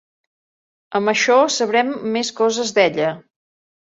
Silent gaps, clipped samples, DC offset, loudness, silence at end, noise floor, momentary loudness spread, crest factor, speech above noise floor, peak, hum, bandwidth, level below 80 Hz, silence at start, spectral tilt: none; under 0.1%; under 0.1%; -18 LUFS; 0.6 s; under -90 dBFS; 9 LU; 18 dB; over 73 dB; -2 dBFS; none; 8 kHz; -68 dBFS; 0.9 s; -3 dB/octave